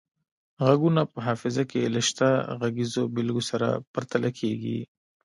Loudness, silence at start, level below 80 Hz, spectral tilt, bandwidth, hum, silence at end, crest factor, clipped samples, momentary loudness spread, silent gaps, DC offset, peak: -26 LUFS; 0.6 s; -66 dBFS; -5.5 dB/octave; 11.5 kHz; none; 0.4 s; 20 dB; under 0.1%; 8 LU; 3.87-3.94 s; under 0.1%; -6 dBFS